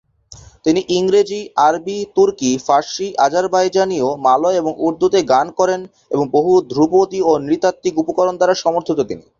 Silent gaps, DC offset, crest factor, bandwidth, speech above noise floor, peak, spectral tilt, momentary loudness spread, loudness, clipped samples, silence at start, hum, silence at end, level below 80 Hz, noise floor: none; under 0.1%; 14 dB; 7.6 kHz; 27 dB; -2 dBFS; -5 dB/octave; 6 LU; -16 LUFS; under 0.1%; 0.3 s; none; 0.2 s; -54 dBFS; -42 dBFS